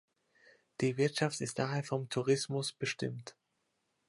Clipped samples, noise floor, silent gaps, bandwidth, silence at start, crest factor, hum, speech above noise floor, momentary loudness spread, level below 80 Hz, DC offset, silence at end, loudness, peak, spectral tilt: under 0.1%; -81 dBFS; none; 11.5 kHz; 0.8 s; 20 dB; none; 47 dB; 10 LU; -76 dBFS; under 0.1%; 0.8 s; -35 LUFS; -16 dBFS; -5 dB/octave